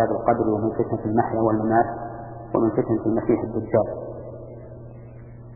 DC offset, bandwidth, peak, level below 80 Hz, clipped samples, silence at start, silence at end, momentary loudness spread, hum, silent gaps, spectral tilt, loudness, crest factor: under 0.1%; 2.5 kHz; -4 dBFS; -48 dBFS; under 0.1%; 0 s; 0 s; 19 LU; none; none; -15.5 dB/octave; -23 LUFS; 20 dB